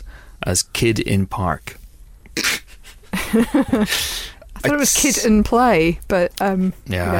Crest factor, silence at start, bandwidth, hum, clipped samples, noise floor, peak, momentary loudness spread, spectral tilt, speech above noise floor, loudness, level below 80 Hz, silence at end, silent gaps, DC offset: 14 dB; 0 s; 16.5 kHz; none; under 0.1%; -42 dBFS; -6 dBFS; 13 LU; -4 dB/octave; 24 dB; -18 LUFS; -36 dBFS; 0 s; none; under 0.1%